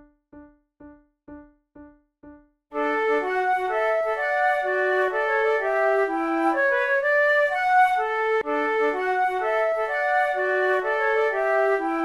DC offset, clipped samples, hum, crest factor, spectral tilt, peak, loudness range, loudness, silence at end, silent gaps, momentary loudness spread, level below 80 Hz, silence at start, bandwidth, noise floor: under 0.1%; under 0.1%; none; 14 dB; -3.5 dB/octave; -8 dBFS; 6 LU; -22 LUFS; 0 s; none; 4 LU; -60 dBFS; 0.35 s; 13 kHz; -49 dBFS